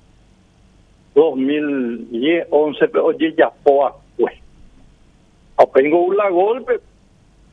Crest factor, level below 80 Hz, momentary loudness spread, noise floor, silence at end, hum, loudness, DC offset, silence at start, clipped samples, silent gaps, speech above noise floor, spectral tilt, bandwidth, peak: 18 dB; -54 dBFS; 8 LU; -51 dBFS; 0.75 s; none; -17 LUFS; under 0.1%; 1.15 s; under 0.1%; none; 35 dB; -7 dB/octave; 6 kHz; 0 dBFS